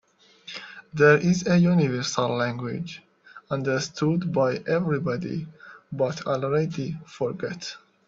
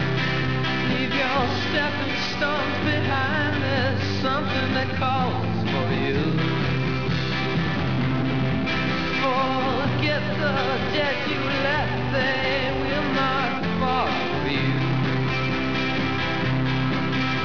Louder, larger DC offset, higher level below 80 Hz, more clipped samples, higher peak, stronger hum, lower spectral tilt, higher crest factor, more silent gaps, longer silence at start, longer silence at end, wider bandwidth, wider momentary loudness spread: about the same, -24 LUFS vs -23 LUFS; second, under 0.1% vs 2%; second, -62 dBFS vs -44 dBFS; neither; first, -4 dBFS vs -10 dBFS; neither; about the same, -6 dB/octave vs -6.5 dB/octave; first, 20 dB vs 14 dB; neither; first, 0.45 s vs 0 s; first, 0.3 s vs 0 s; first, 7.6 kHz vs 5.4 kHz; first, 18 LU vs 2 LU